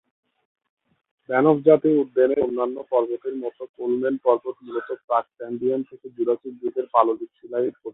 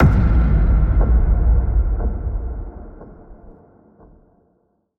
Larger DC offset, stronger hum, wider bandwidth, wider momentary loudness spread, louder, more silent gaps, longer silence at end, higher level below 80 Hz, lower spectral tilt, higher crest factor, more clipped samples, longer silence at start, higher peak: neither; neither; first, 4 kHz vs 2.6 kHz; second, 13 LU vs 17 LU; second, -23 LUFS vs -19 LUFS; first, 3.69-3.74 s, 5.04-5.08 s vs none; second, 0.05 s vs 1.5 s; second, -68 dBFS vs -18 dBFS; about the same, -11.5 dB/octave vs -10.5 dB/octave; first, 22 dB vs 14 dB; neither; first, 1.3 s vs 0 s; about the same, -2 dBFS vs -4 dBFS